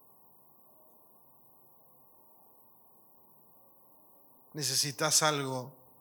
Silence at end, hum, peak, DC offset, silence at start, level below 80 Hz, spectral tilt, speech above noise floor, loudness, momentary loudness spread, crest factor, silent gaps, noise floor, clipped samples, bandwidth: 0.3 s; none; -12 dBFS; under 0.1%; 4.55 s; under -90 dBFS; -2 dB/octave; 30 dB; -29 LUFS; 19 LU; 26 dB; none; -61 dBFS; under 0.1%; 19 kHz